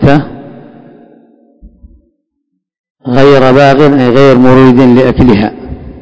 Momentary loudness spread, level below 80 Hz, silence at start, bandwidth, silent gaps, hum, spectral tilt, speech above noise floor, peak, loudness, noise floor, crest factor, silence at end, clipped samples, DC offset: 21 LU; -30 dBFS; 0 s; 8 kHz; 2.79-2.84 s, 2.90-2.95 s; none; -8 dB/octave; 63 dB; 0 dBFS; -5 LUFS; -67 dBFS; 8 dB; 0 s; 10%; under 0.1%